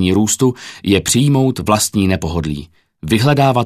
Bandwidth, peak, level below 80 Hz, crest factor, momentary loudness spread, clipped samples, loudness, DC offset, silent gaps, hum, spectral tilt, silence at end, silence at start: 14.5 kHz; 0 dBFS; -38 dBFS; 14 dB; 11 LU; under 0.1%; -15 LUFS; under 0.1%; none; none; -5 dB/octave; 0 s; 0 s